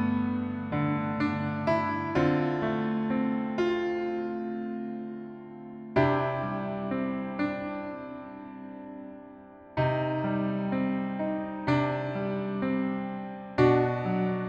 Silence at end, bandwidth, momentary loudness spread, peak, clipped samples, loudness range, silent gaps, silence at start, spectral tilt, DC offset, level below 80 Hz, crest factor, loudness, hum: 0 s; 7.4 kHz; 16 LU; -10 dBFS; under 0.1%; 5 LU; none; 0 s; -8.5 dB/octave; under 0.1%; -58 dBFS; 20 dB; -29 LUFS; none